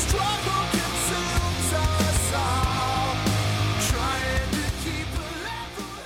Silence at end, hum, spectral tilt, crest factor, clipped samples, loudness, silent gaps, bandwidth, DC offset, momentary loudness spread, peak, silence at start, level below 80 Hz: 0 s; none; -4 dB/octave; 14 dB; under 0.1%; -25 LUFS; none; 17 kHz; under 0.1%; 8 LU; -12 dBFS; 0 s; -32 dBFS